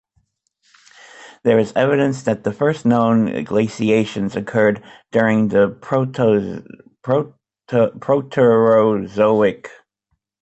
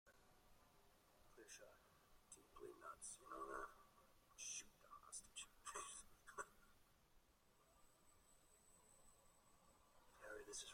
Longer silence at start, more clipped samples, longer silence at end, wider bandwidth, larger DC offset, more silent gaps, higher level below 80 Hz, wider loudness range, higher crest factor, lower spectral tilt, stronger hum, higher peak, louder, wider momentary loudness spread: first, 1.2 s vs 0.05 s; neither; first, 0.75 s vs 0 s; second, 8.2 kHz vs 16 kHz; neither; neither; first, -56 dBFS vs -78 dBFS; second, 2 LU vs 9 LU; second, 16 dB vs 24 dB; first, -7.5 dB/octave vs -1 dB/octave; neither; first, -2 dBFS vs -38 dBFS; first, -17 LUFS vs -57 LUFS; second, 7 LU vs 13 LU